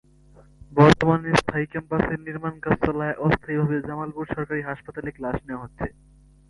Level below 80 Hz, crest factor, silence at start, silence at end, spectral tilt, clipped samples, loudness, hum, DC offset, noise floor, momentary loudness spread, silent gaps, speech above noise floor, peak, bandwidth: -44 dBFS; 22 dB; 0.6 s; 0.6 s; -7 dB/octave; under 0.1%; -24 LUFS; none; under 0.1%; -52 dBFS; 16 LU; none; 29 dB; -2 dBFS; 11.5 kHz